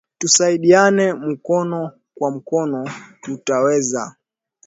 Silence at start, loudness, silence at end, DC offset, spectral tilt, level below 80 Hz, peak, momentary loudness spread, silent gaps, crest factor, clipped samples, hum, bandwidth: 0.2 s; -17 LUFS; 0.55 s; under 0.1%; -3.5 dB/octave; -66 dBFS; 0 dBFS; 18 LU; none; 18 dB; under 0.1%; none; 8 kHz